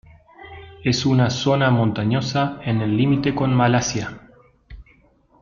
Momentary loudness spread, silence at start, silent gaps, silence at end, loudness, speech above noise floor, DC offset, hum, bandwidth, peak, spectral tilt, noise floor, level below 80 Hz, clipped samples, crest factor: 12 LU; 0.4 s; none; 0.6 s; -20 LUFS; 37 dB; under 0.1%; none; 7.2 kHz; -4 dBFS; -6 dB/octave; -56 dBFS; -48 dBFS; under 0.1%; 16 dB